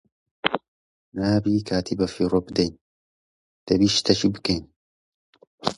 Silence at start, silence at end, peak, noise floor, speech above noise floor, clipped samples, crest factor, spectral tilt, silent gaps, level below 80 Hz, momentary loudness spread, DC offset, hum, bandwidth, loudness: 0.45 s; 0.05 s; 0 dBFS; under -90 dBFS; over 68 dB; under 0.1%; 24 dB; -5 dB/octave; 0.68-1.12 s, 2.81-3.67 s, 4.76-5.33 s, 5.47-5.58 s; -48 dBFS; 9 LU; under 0.1%; none; 11.5 kHz; -23 LUFS